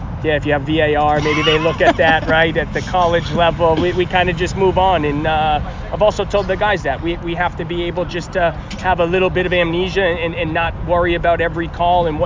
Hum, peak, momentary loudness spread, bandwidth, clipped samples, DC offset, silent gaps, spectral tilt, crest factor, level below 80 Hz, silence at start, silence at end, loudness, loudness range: none; -2 dBFS; 6 LU; 7.6 kHz; under 0.1%; under 0.1%; none; -6 dB/octave; 14 dB; -30 dBFS; 0 s; 0 s; -16 LUFS; 4 LU